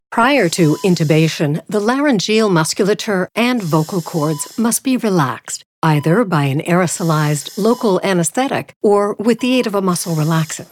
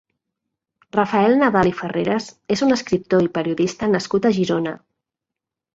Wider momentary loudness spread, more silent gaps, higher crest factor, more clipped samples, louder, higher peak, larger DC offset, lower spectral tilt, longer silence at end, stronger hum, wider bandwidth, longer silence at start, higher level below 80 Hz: second, 5 LU vs 9 LU; first, 5.66-5.82 s, 8.76-8.81 s vs none; about the same, 14 dB vs 18 dB; neither; first, -16 LUFS vs -19 LUFS; about the same, -2 dBFS vs -2 dBFS; neither; about the same, -5 dB/octave vs -6 dB/octave; second, 0.1 s vs 1 s; neither; first, 17 kHz vs 8 kHz; second, 0.1 s vs 0.95 s; second, -62 dBFS vs -52 dBFS